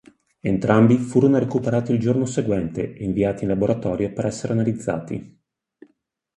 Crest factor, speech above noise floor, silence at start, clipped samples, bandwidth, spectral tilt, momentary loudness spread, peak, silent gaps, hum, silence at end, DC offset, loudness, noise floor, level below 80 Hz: 20 dB; 48 dB; 0.45 s; under 0.1%; 11 kHz; -8 dB/octave; 11 LU; -2 dBFS; none; none; 1.1 s; under 0.1%; -21 LUFS; -68 dBFS; -48 dBFS